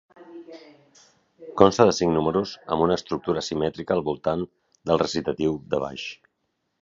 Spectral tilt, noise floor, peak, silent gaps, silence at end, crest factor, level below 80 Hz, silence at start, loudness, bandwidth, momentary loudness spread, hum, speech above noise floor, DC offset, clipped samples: -5.5 dB/octave; -76 dBFS; 0 dBFS; none; 0.7 s; 24 dB; -52 dBFS; 0.2 s; -24 LUFS; 7.8 kHz; 17 LU; none; 53 dB; under 0.1%; under 0.1%